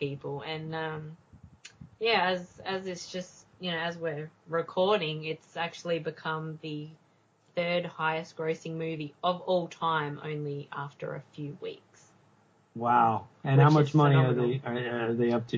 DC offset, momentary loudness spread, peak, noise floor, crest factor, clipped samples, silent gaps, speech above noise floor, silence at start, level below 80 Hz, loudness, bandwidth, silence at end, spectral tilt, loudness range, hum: under 0.1%; 17 LU; -8 dBFS; -66 dBFS; 22 dB; under 0.1%; none; 37 dB; 0 s; -70 dBFS; -30 LUFS; 7.6 kHz; 0 s; -7 dB/octave; 8 LU; none